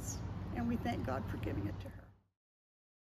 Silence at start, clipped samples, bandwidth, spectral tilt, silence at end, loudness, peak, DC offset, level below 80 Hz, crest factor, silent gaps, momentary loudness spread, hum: 0 s; under 0.1%; 15 kHz; -6 dB/octave; 1.05 s; -40 LUFS; -26 dBFS; under 0.1%; -52 dBFS; 16 dB; none; 11 LU; none